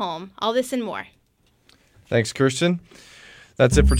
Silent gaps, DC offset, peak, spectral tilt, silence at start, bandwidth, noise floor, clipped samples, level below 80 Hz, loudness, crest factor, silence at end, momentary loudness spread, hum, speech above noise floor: none; under 0.1%; -2 dBFS; -5.5 dB/octave; 0 s; 14.5 kHz; -63 dBFS; under 0.1%; -30 dBFS; -23 LUFS; 20 dB; 0 s; 23 LU; none; 42 dB